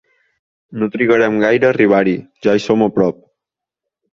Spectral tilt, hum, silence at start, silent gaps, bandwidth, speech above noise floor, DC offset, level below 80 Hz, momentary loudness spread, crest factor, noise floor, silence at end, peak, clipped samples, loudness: -7 dB/octave; none; 0.7 s; none; 7.6 kHz; 70 dB; under 0.1%; -54 dBFS; 8 LU; 14 dB; -84 dBFS; 1 s; -2 dBFS; under 0.1%; -14 LUFS